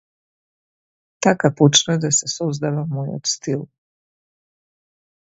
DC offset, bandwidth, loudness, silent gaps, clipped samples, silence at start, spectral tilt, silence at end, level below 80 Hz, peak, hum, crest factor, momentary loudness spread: under 0.1%; 8 kHz; -19 LUFS; none; under 0.1%; 1.2 s; -4 dB/octave; 1.55 s; -62 dBFS; 0 dBFS; none; 22 dB; 11 LU